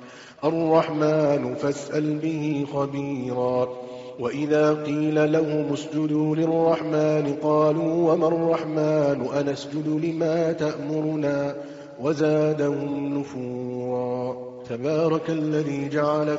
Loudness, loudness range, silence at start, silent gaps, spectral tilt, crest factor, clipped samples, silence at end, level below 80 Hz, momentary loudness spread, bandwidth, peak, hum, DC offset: -24 LUFS; 4 LU; 0 s; none; -7 dB/octave; 16 dB; under 0.1%; 0 s; -66 dBFS; 9 LU; 7.8 kHz; -6 dBFS; none; under 0.1%